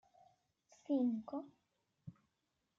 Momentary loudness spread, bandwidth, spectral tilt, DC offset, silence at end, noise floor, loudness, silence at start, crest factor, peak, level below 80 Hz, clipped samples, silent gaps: 23 LU; 7.2 kHz; -8.5 dB/octave; under 0.1%; 0.65 s; -86 dBFS; -40 LUFS; 0.9 s; 18 dB; -26 dBFS; -88 dBFS; under 0.1%; none